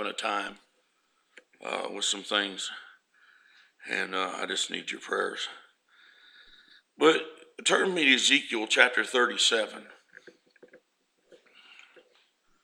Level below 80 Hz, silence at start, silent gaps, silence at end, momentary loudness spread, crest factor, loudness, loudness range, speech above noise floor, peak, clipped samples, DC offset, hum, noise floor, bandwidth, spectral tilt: -82 dBFS; 0 s; none; 1.9 s; 15 LU; 28 dB; -26 LUFS; 9 LU; 45 dB; -2 dBFS; under 0.1%; under 0.1%; none; -73 dBFS; 15.5 kHz; -1 dB/octave